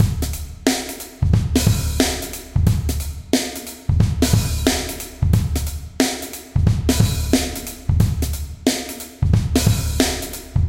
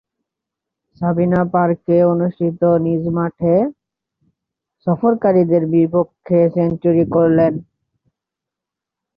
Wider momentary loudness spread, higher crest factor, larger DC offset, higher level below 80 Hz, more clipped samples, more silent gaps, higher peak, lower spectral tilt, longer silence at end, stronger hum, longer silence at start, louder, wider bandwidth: first, 9 LU vs 6 LU; about the same, 18 dB vs 14 dB; first, 0.2% vs under 0.1%; first, -26 dBFS vs -52 dBFS; neither; neither; about the same, 0 dBFS vs -2 dBFS; second, -5 dB/octave vs -12.5 dB/octave; second, 0 s vs 1.55 s; neither; second, 0 s vs 1 s; second, -20 LUFS vs -16 LUFS; first, 17 kHz vs 4.9 kHz